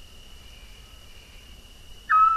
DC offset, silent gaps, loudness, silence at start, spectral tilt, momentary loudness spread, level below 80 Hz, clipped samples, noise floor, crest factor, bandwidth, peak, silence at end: under 0.1%; none; -21 LUFS; 1.9 s; -2 dB/octave; 26 LU; -48 dBFS; under 0.1%; -46 dBFS; 16 dB; 14 kHz; -10 dBFS; 0 s